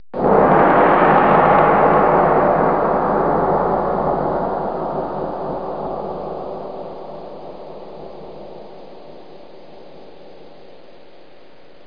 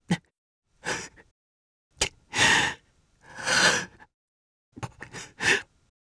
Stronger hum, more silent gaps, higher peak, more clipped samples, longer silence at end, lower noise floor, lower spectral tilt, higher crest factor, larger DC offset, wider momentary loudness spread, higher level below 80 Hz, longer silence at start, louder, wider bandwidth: neither; second, none vs 0.38-0.62 s, 1.31-1.91 s, 4.14-4.72 s; first, 0 dBFS vs -8 dBFS; neither; first, 1.6 s vs 0.55 s; second, -46 dBFS vs -61 dBFS; first, -10 dB/octave vs -1.5 dB/octave; about the same, 18 dB vs 22 dB; first, 1% vs under 0.1%; about the same, 23 LU vs 21 LU; first, -44 dBFS vs -56 dBFS; about the same, 0.15 s vs 0.1 s; first, -16 LUFS vs -24 LUFS; second, 5.2 kHz vs 11 kHz